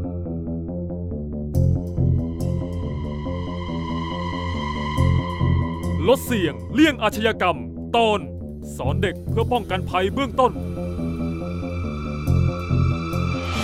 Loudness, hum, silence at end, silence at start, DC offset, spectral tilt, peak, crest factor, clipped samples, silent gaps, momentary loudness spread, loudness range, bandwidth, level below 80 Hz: -23 LUFS; none; 0 s; 0 s; under 0.1%; -6.5 dB/octave; -4 dBFS; 18 dB; under 0.1%; none; 9 LU; 4 LU; 15.5 kHz; -34 dBFS